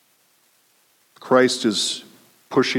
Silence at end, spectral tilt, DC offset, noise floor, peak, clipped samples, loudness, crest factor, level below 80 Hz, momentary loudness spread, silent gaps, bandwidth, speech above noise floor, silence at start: 0 s; -3.5 dB/octave; under 0.1%; -61 dBFS; -4 dBFS; under 0.1%; -20 LUFS; 20 dB; -74 dBFS; 7 LU; none; 16.5 kHz; 42 dB; 1.25 s